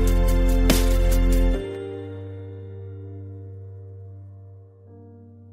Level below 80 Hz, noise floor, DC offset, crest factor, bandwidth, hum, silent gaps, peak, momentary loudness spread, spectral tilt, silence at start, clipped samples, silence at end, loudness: -24 dBFS; -46 dBFS; under 0.1%; 18 dB; 16 kHz; none; none; -6 dBFS; 24 LU; -5.5 dB/octave; 0 s; under 0.1%; 0.5 s; -23 LUFS